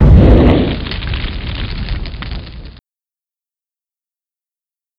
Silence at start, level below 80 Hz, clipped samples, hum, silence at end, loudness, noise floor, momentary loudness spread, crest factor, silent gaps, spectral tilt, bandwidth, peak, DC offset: 0 s; -18 dBFS; 0.7%; none; 2.3 s; -14 LUFS; under -90 dBFS; 20 LU; 14 dB; none; -9.5 dB/octave; 5.4 kHz; 0 dBFS; under 0.1%